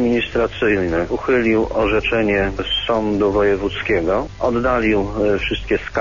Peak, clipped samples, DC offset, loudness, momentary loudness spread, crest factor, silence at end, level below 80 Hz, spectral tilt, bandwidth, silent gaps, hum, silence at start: -6 dBFS; under 0.1%; 0.6%; -18 LUFS; 4 LU; 12 dB; 0 s; -34 dBFS; -6.5 dB/octave; 7.4 kHz; none; none; 0 s